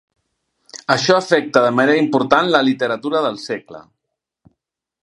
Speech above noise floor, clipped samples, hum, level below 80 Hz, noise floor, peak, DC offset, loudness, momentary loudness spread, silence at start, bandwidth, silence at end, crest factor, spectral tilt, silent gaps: 63 dB; under 0.1%; none; -62 dBFS; -80 dBFS; 0 dBFS; under 0.1%; -16 LUFS; 13 LU; 0.75 s; 11.5 kHz; 1.2 s; 18 dB; -4.5 dB/octave; none